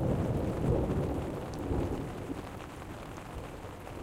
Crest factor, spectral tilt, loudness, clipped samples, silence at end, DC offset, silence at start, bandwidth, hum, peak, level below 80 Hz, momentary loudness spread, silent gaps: 16 dB; -7.5 dB/octave; -36 LUFS; under 0.1%; 0 s; under 0.1%; 0 s; 16.5 kHz; none; -18 dBFS; -42 dBFS; 13 LU; none